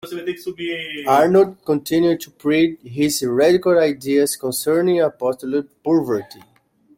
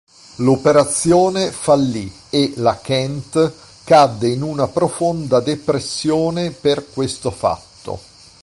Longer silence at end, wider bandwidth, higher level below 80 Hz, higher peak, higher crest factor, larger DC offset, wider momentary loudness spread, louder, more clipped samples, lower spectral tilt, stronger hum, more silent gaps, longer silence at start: first, 0.75 s vs 0.4 s; first, 16.5 kHz vs 11.5 kHz; second, -60 dBFS vs -48 dBFS; about the same, -2 dBFS vs -2 dBFS; about the same, 16 dB vs 16 dB; neither; about the same, 10 LU vs 9 LU; about the same, -19 LUFS vs -17 LUFS; neither; about the same, -5 dB/octave vs -5 dB/octave; neither; neither; second, 0.05 s vs 0.4 s